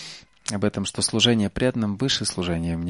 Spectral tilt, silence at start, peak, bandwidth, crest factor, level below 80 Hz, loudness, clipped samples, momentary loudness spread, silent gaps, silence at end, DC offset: -4 dB/octave; 0 s; -6 dBFS; 11.5 kHz; 18 dB; -46 dBFS; -23 LUFS; under 0.1%; 10 LU; none; 0 s; under 0.1%